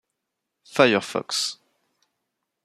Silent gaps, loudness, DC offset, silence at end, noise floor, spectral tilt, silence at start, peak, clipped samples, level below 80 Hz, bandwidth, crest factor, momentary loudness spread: none; -22 LUFS; under 0.1%; 1.1 s; -82 dBFS; -3 dB/octave; 0.7 s; -2 dBFS; under 0.1%; -72 dBFS; 14 kHz; 24 dB; 12 LU